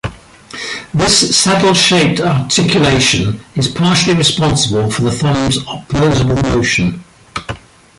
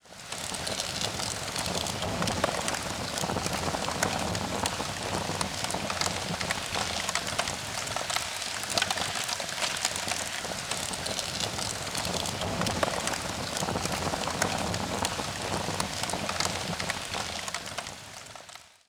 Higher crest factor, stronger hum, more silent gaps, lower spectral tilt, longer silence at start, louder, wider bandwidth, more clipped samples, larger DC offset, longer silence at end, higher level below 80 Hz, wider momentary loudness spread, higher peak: second, 14 dB vs 24 dB; neither; neither; first, -4 dB/octave vs -2.5 dB/octave; about the same, 0.05 s vs 0.05 s; first, -12 LUFS vs -30 LUFS; second, 11.5 kHz vs over 20 kHz; neither; neither; first, 0.45 s vs 0.2 s; first, -34 dBFS vs -52 dBFS; first, 16 LU vs 4 LU; first, 0 dBFS vs -8 dBFS